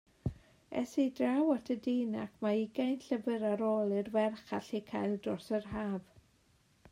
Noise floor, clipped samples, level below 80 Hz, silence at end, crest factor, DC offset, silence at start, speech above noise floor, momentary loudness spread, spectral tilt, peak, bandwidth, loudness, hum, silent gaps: -69 dBFS; under 0.1%; -64 dBFS; 0.9 s; 16 dB; under 0.1%; 0.25 s; 36 dB; 9 LU; -7 dB/octave; -20 dBFS; 15.5 kHz; -35 LUFS; none; none